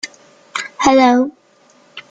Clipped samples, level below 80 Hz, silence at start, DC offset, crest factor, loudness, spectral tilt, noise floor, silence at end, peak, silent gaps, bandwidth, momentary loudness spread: under 0.1%; -52 dBFS; 0.05 s; under 0.1%; 16 dB; -15 LUFS; -3 dB/octave; -51 dBFS; 0.1 s; -2 dBFS; none; 9.2 kHz; 19 LU